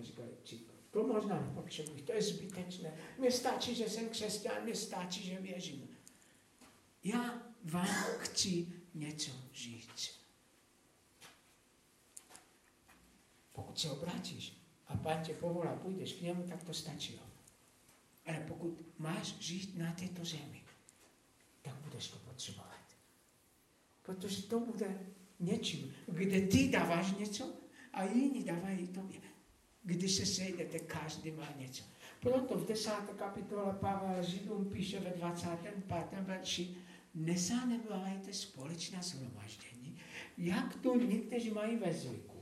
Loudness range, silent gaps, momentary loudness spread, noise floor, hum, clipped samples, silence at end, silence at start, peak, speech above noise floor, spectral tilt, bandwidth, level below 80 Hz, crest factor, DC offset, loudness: 11 LU; none; 17 LU; -70 dBFS; none; under 0.1%; 0 s; 0 s; -16 dBFS; 31 dB; -4.5 dB/octave; 15.5 kHz; -72 dBFS; 24 dB; under 0.1%; -40 LUFS